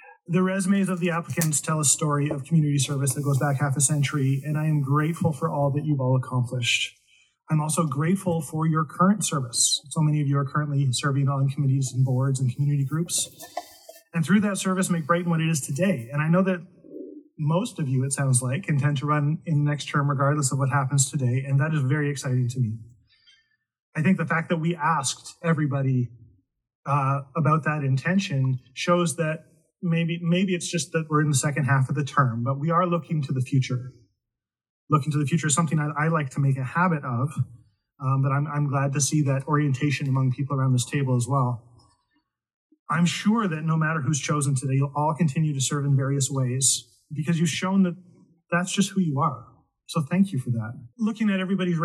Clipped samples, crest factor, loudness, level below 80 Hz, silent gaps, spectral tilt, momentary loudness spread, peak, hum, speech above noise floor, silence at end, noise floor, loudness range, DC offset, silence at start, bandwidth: under 0.1%; 18 dB; -24 LUFS; -68 dBFS; 23.82-23.93 s, 26.75-26.83 s, 34.70-34.87 s, 42.54-42.70 s, 42.79-42.86 s; -5 dB/octave; 6 LU; -6 dBFS; none; 64 dB; 0 s; -88 dBFS; 3 LU; under 0.1%; 0.3 s; 15 kHz